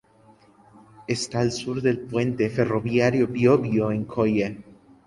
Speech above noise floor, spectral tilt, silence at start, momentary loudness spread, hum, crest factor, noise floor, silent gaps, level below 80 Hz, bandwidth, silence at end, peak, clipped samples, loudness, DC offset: 33 dB; -6.5 dB/octave; 1 s; 9 LU; none; 18 dB; -55 dBFS; none; -56 dBFS; 11.5 kHz; 0.35 s; -6 dBFS; under 0.1%; -23 LUFS; under 0.1%